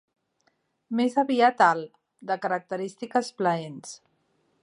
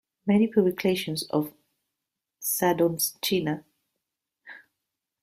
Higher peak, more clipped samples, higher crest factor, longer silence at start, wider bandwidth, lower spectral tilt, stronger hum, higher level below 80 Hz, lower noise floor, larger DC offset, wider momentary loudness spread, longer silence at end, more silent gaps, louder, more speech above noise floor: about the same, -6 dBFS vs -8 dBFS; neither; about the same, 22 dB vs 20 dB; first, 0.9 s vs 0.25 s; second, 11 kHz vs 16 kHz; about the same, -5 dB/octave vs -4.5 dB/octave; neither; second, -80 dBFS vs -66 dBFS; second, -71 dBFS vs -86 dBFS; neither; first, 21 LU vs 10 LU; about the same, 0.65 s vs 0.65 s; neither; about the same, -25 LUFS vs -26 LUFS; second, 46 dB vs 61 dB